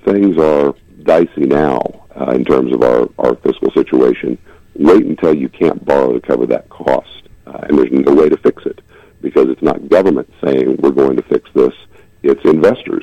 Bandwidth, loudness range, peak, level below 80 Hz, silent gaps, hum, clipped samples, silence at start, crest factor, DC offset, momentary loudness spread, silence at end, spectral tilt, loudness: 8.8 kHz; 1 LU; -2 dBFS; -44 dBFS; none; none; under 0.1%; 0.05 s; 12 dB; under 0.1%; 9 LU; 0 s; -8 dB/octave; -13 LUFS